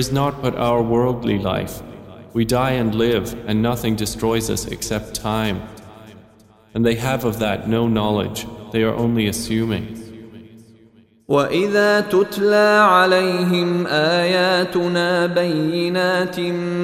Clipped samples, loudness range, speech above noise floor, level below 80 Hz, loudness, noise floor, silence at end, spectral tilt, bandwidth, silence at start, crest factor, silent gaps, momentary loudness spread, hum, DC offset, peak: under 0.1%; 7 LU; 33 dB; -44 dBFS; -19 LUFS; -51 dBFS; 0 s; -5 dB/octave; 16 kHz; 0 s; 16 dB; none; 10 LU; none; under 0.1%; -2 dBFS